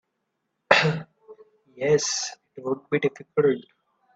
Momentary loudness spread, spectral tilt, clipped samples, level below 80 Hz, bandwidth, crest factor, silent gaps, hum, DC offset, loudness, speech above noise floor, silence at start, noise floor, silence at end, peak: 13 LU; -3.5 dB/octave; under 0.1%; -66 dBFS; 8 kHz; 26 dB; none; none; under 0.1%; -24 LUFS; 53 dB; 0.7 s; -78 dBFS; 0.55 s; 0 dBFS